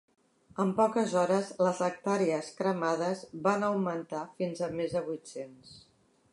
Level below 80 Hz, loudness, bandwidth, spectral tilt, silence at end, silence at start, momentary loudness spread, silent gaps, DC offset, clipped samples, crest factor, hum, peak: -72 dBFS; -31 LUFS; 11.5 kHz; -6 dB/octave; 0.55 s; 0.55 s; 12 LU; none; under 0.1%; under 0.1%; 18 dB; none; -12 dBFS